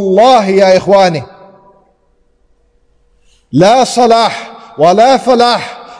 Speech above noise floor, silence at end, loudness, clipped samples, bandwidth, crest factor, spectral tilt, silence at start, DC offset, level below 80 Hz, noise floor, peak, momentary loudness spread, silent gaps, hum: 46 dB; 0.05 s; -8 LUFS; 0.2%; 10.5 kHz; 10 dB; -5 dB/octave; 0 s; under 0.1%; -50 dBFS; -53 dBFS; 0 dBFS; 10 LU; none; none